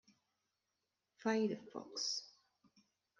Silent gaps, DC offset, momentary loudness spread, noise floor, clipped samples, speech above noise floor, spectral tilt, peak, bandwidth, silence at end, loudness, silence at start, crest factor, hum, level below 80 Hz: none; under 0.1%; 10 LU; -88 dBFS; under 0.1%; 49 dB; -3.5 dB/octave; -24 dBFS; 9.6 kHz; 0.9 s; -40 LUFS; 1.2 s; 20 dB; none; under -90 dBFS